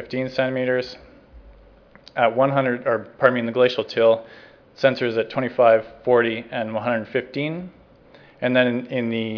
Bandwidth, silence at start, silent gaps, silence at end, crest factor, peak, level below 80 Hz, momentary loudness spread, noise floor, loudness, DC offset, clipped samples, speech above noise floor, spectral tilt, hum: 5.4 kHz; 0 s; none; 0 s; 22 dB; 0 dBFS; -58 dBFS; 9 LU; -50 dBFS; -21 LUFS; under 0.1%; under 0.1%; 29 dB; -7 dB/octave; none